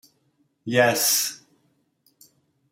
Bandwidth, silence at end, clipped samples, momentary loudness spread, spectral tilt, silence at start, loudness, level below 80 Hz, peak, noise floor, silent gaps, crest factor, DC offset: 16.5 kHz; 1.35 s; under 0.1%; 21 LU; -2 dB/octave; 0.65 s; -20 LUFS; -74 dBFS; -6 dBFS; -68 dBFS; none; 22 dB; under 0.1%